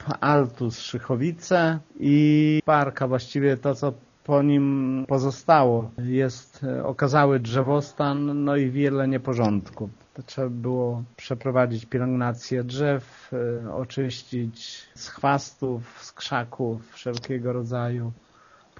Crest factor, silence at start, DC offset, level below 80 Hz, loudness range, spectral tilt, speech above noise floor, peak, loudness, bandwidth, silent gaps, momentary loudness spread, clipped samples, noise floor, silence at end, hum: 20 dB; 0 s; under 0.1%; -62 dBFS; 7 LU; -6.5 dB/octave; 32 dB; -4 dBFS; -24 LUFS; 7.2 kHz; none; 13 LU; under 0.1%; -56 dBFS; 0.65 s; none